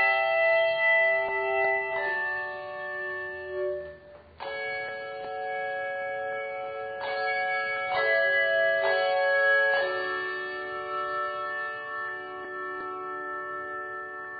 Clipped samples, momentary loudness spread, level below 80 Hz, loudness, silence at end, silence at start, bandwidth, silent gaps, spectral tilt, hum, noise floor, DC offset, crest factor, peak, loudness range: under 0.1%; 13 LU; -68 dBFS; -28 LUFS; 0 s; 0 s; 5 kHz; none; 0.5 dB/octave; none; -49 dBFS; under 0.1%; 16 dB; -14 dBFS; 9 LU